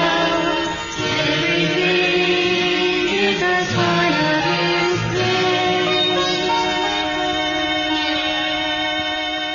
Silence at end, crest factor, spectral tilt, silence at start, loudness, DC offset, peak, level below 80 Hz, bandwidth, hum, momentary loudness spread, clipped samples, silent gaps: 0 s; 12 dB; -4 dB/octave; 0 s; -18 LUFS; under 0.1%; -6 dBFS; -46 dBFS; 7.4 kHz; none; 4 LU; under 0.1%; none